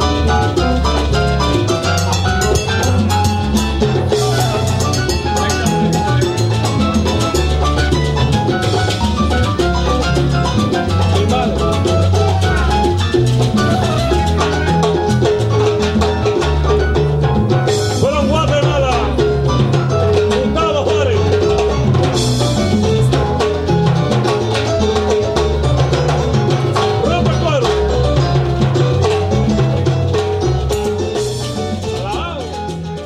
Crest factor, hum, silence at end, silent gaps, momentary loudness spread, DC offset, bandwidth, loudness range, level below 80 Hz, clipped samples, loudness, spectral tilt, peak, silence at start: 12 dB; none; 0 s; none; 2 LU; under 0.1%; 14.5 kHz; 1 LU; -24 dBFS; under 0.1%; -15 LUFS; -6 dB/octave; -2 dBFS; 0 s